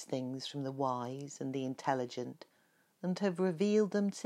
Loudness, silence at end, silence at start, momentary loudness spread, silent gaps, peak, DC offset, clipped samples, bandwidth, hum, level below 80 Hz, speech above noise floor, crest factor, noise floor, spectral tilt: -36 LUFS; 0 s; 0 s; 12 LU; none; -18 dBFS; under 0.1%; under 0.1%; 12.5 kHz; none; under -90 dBFS; 37 dB; 18 dB; -72 dBFS; -6 dB/octave